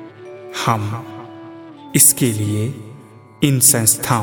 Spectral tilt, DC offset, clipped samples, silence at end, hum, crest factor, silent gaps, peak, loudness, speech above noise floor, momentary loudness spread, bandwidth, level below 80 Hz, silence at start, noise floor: -3.5 dB/octave; under 0.1%; under 0.1%; 0 s; none; 18 dB; none; 0 dBFS; -14 LUFS; 25 dB; 25 LU; 17.5 kHz; -54 dBFS; 0 s; -41 dBFS